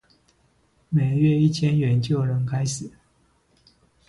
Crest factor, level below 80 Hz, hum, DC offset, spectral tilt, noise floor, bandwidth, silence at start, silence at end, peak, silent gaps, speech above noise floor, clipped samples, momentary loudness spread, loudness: 16 dB; -56 dBFS; none; under 0.1%; -7 dB/octave; -63 dBFS; 11.5 kHz; 0.9 s; 1.2 s; -8 dBFS; none; 43 dB; under 0.1%; 9 LU; -22 LUFS